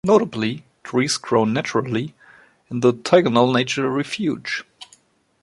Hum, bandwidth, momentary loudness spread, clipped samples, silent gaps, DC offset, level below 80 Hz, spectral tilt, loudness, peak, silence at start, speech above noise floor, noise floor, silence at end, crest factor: none; 11.5 kHz; 11 LU; under 0.1%; none; under 0.1%; -60 dBFS; -5 dB/octave; -20 LUFS; -2 dBFS; 0.05 s; 37 dB; -56 dBFS; 0.6 s; 20 dB